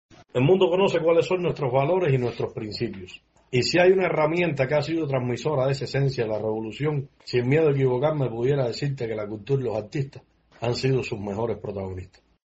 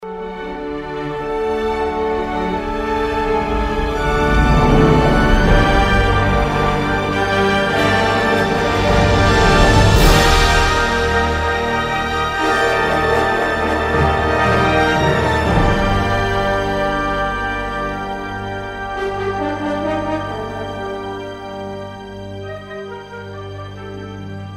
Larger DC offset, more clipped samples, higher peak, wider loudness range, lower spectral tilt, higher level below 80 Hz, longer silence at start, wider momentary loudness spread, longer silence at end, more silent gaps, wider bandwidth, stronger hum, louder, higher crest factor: neither; neither; second, -8 dBFS vs 0 dBFS; second, 4 LU vs 11 LU; about the same, -5.5 dB/octave vs -5.5 dB/octave; second, -56 dBFS vs -24 dBFS; first, 0.35 s vs 0 s; second, 12 LU vs 17 LU; first, 0.4 s vs 0 s; neither; second, 8 kHz vs 16 kHz; neither; second, -24 LUFS vs -16 LUFS; about the same, 16 dB vs 16 dB